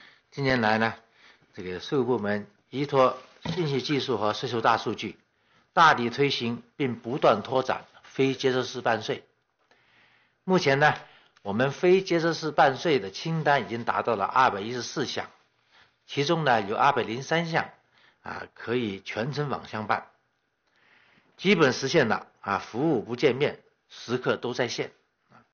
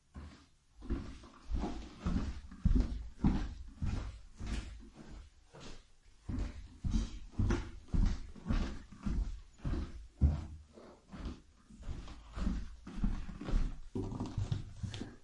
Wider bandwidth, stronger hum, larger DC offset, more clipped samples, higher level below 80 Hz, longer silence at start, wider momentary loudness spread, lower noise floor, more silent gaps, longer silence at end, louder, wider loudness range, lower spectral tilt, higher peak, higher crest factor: second, 7 kHz vs 10 kHz; neither; neither; neither; second, -66 dBFS vs -40 dBFS; first, 0.35 s vs 0.15 s; second, 14 LU vs 19 LU; first, -74 dBFS vs -61 dBFS; neither; first, 0.65 s vs 0 s; first, -26 LUFS vs -40 LUFS; about the same, 4 LU vs 6 LU; second, -3.5 dB/octave vs -7 dB/octave; first, -8 dBFS vs -18 dBFS; about the same, 18 dB vs 20 dB